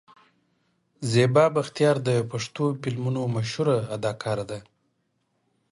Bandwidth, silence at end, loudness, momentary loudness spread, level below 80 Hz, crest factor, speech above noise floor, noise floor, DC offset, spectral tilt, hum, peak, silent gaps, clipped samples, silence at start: 11.5 kHz; 1.1 s; -25 LUFS; 11 LU; -62 dBFS; 20 dB; 49 dB; -73 dBFS; under 0.1%; -6 dB/octave; none; -6 dBFS; none; under 0.1%; 1 s